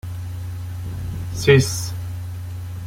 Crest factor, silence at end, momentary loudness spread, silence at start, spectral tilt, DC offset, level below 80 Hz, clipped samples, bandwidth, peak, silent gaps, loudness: 20 dB; 0 s; 16 LU; 0.05 s; -5 dB/octave; under 0.1%; -42 dBFS; under 0.1%; 16.5 kHz; -2 dBFS; none; -22 LUFS